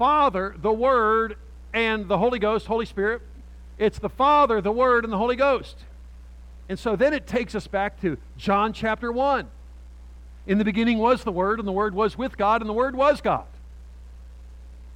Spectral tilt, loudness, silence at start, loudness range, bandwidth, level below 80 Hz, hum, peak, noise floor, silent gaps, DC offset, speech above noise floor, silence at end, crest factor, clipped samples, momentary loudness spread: -6.5 dB/octave; -23 LUFS; 0 s; 4 LU; 11 kHz; -42 dBFS; 60 Hz at -40 dBFS; -8 dBFS; -43 dBFS; none; under 0.1%; 20 dB; 0 s; 16 dB; under 0.1%; 9 LU